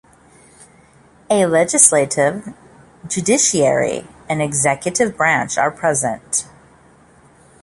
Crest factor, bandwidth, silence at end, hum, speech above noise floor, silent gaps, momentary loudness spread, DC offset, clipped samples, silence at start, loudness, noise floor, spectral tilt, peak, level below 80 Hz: 18 dB; 16 kHz; 1.2 s; none; 33 dB; none; 14 LU; under 0.1%; under 0.1%; 1.3 s; -16 LUFS; -49 dBFS; -3 dB/octave; 0 dBFS; -54 dBFS